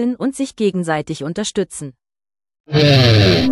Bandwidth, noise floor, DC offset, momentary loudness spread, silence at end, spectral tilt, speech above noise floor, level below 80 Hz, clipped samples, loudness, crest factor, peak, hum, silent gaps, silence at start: 13.5 kHz; under -90 dBFS; under 0.1%; 14 LU; 0 s; -5.5 dB/octave; over 75 dB; -40 dBFS; under 0.1%; -16 LUFS; 14 dB; -2 dBFS; none; 2.60-2.64 s; 0 s